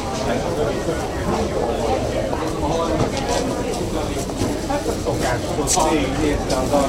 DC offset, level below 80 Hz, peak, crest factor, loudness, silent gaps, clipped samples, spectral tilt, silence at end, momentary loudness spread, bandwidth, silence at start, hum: under 0.1%; -32 dBFS; -4 dBFS; 16 dB; -21 LUFS; none; under 0.1%; -4.5 dB/octave; 0 s; 5 LU; 16 kHz; 0 s; none